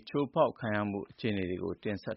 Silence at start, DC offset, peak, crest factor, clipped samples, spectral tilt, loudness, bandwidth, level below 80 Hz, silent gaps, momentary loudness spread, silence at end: 0.05 s; under 0.1%; -14 dBFS; 20 dB; under 0.1%; -5.5 dB/octave; -33 LUFS; 5.8 kHz; -64 dBFS; none; 7 LU; 0 s